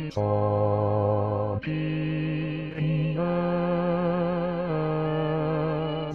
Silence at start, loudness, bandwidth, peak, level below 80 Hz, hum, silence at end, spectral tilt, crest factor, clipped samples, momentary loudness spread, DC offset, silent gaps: 0 s; -27 LUFS; 6 kHz; -14 dBFS; -52 dBFS; none; 0 s; -9.5 dB/octave; 12 dB; under 0.1%; 4 LU; 0.2%; none